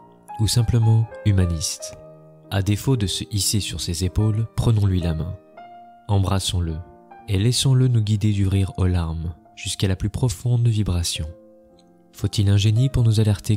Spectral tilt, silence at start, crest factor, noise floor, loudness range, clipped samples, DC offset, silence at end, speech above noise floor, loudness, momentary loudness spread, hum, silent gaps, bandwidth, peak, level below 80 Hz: -5.5 dB/octave; 0.3 s; 14 dB; -52 dBFS; 2 LU; under 0.1%; under 0.1%; 0 s; 33 dB; -21 LUFS; 11 LU; none; none; 16 kHz; -8 dBFS; -36 dBFS